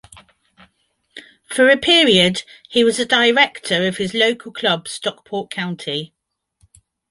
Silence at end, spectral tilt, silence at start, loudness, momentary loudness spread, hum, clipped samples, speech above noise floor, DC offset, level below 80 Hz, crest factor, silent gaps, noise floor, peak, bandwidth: 1.05 s; -3.5 dB/octave; 1.15 s; -16 LUFS; 15 LU; none; under 0.1%; 48 dB; under 0.1%; -58 dBFS; 18 dB; none; -65 dBFS; -2 dBFS; 11.5 kHz